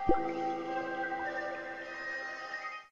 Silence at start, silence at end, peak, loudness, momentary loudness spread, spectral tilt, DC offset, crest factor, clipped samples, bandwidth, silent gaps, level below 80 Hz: 0 s; 0 s; -14 dBFS; -37 LUFS; 7 LU; -5.5 dB/octave; under 0.1%; 22 dB; under 0.1%; 7.4 kHz; none; -52 dBFS